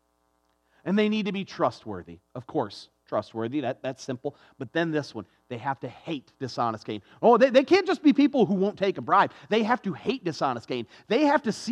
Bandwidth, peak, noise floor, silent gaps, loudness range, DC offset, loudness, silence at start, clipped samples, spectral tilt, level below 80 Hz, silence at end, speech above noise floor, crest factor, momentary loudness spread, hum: 10.5 kHz; -6 dBFS; -71 dBFS; none; 10 LU; under 0.1%; -26 LUFS; 0.85 s; under 0.1%; -6 dB/octave; -74 dBFS; 0 s; 45 dB; 20 dB; 17 LU; none